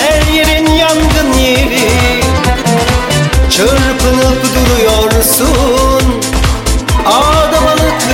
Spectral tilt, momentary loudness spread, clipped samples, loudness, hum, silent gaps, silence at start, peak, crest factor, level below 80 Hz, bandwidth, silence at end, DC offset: -4 dB/octave; 3 LU; under 0.1%; -9 LUFS; none; none; 0 s; 0 dBFS; 8 dB; -16 dBFS; 17 kHz; 0 s; under 0.1%